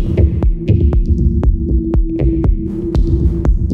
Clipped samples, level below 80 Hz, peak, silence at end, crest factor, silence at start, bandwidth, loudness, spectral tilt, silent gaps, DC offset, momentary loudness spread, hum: under 0.1%; -14 dBFS; -2 dBFS; 0 s; 12 dB; 0 s; 4.5 kHz; -15 LUFS; -11 dB/octave; none; under 0.1%; 3 LU; none